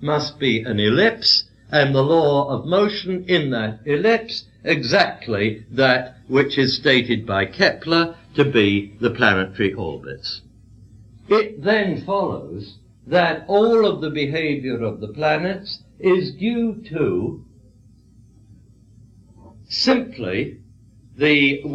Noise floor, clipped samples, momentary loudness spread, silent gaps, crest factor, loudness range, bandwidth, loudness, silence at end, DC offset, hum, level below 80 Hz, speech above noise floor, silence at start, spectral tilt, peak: -50 dBFS; under 0.1%; 11 LU; none; 20 dB; 8 LU; 8.4 kHz; -19 LUFS; 0 s; under 0.1%; none; -52 dBFS; 31 dB; 0 s; -6 dB/octave; -2 dBFS